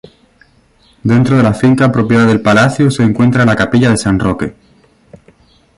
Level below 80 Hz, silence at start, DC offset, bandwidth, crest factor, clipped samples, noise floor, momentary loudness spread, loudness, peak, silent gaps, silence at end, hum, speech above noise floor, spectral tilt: -38 dBFS; 1.05 s; under 0.1%; 11.5 kHz; 12 dB; under 0.1%; -50 dBFS; 6 LU; -11 LUFS; 0 dBFS; none; 1.25 s; none; 40 dB; -6.5 dB/octave